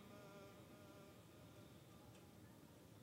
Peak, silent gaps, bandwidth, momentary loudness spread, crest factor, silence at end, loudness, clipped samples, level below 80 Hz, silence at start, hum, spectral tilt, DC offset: -48 dBFS; none; 16 kHz; 3 LU; 14 dB; 0 s; -63 LUFS; under 0.1%; -82 dBFS; 0 s; none; -5 dB/octave; under 0.1%